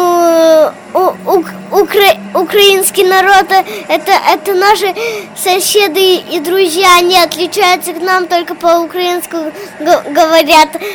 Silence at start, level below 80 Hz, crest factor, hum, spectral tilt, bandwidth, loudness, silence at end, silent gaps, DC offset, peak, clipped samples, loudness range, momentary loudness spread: 0 s; -48 dBFS; 10 dB; none; -2 dB/octave; over 20 kHz; -9 LUFS; 0 s; none; under 0.1%; 0 dBFS; 0.6%; 2 LU; 8 LU